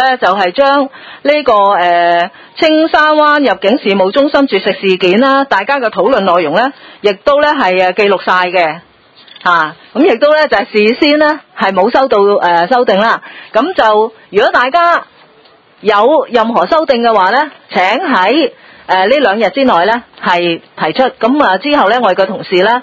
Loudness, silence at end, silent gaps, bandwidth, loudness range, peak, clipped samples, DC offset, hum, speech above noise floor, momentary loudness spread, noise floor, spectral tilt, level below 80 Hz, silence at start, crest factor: -10 LUFS; 0 s; none; 8 kHz; 2 LU; 0 dBFS; 0.4%; under 0.1%; none; 34 dB; 6 LU; -44 dBFS; -5.5 dB/octave; -50 dBFS; 0 s; 10 dB